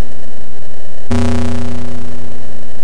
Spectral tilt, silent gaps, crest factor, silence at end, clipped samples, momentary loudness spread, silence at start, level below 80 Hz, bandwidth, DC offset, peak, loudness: -6.5 dB/octave; none; 16 dB; 0 s; under 0.1%; 20 LU; 0 s; -32 dBFS; 10.5 kHz; 80%; -2 dBFS; -21 LUFS